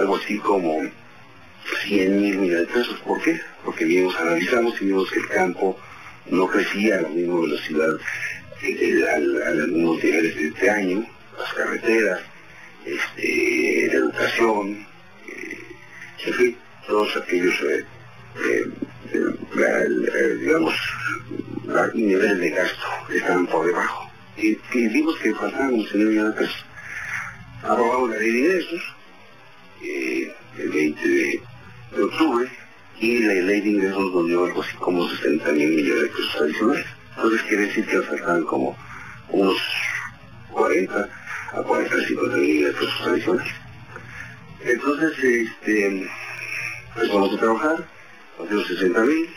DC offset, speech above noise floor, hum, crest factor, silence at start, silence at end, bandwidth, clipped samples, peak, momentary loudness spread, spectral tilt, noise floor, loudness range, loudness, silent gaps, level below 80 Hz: 0.3%; 27 dB; none; 16 dB; 0 s; 0 s; 19 kHz; under 0.1%; -6 dBFS; 13 LU; -5 dB/octave; -48 dBFS; 3 LU; -22 LUFS; none; -58 dBFS